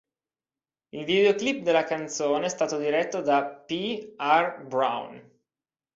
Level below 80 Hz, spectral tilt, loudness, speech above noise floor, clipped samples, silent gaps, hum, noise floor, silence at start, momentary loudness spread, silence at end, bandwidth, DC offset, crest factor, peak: -72 dBFS; -3.5 dB/octave; -26 LUFS; over 64 dB; under 0.1%; none; none; under -90 dBFS; 0.95 s; 10 LU; 0.75 s; 7.8 kHz; under 0.1%; 18 dB; -8 dBFS